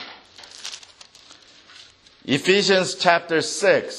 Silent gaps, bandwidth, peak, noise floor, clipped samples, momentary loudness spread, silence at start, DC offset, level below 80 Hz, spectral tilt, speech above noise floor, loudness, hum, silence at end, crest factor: none; 13 kHz; 0 dBFS; -49 dBFS; under 0.1%; 22 LU; 0 s; under 0.1%; -68 dBFS; -3 dB/octave; 30 dB; -19 LUFS; none; 0 s; 22 dB